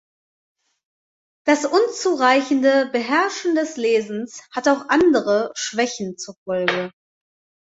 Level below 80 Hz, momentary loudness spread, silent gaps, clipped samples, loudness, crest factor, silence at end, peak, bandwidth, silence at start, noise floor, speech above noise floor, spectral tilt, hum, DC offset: -64 dBFS; 13 LU; 6.37-6.46 s; under 0.1%; -20 LUFS; 18 dB; 0.75 s; -2 dBFS; 8 kHz; 1.45 s; under -90 dBFS; over 71 dB; -3.5 dB/octave; none; under 0.1%